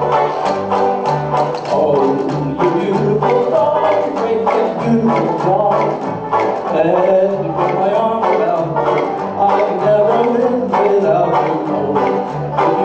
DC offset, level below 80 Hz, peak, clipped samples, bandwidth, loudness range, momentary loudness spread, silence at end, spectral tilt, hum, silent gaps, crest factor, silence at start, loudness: under 0.1%; -50 dBFS; -2 dBFS; under 0.1%; 8 kHz; 1 LU; 4 LU; 0 s; -7.5 dB/octave; none; none; 12 dB; 0 s; -15 LUFS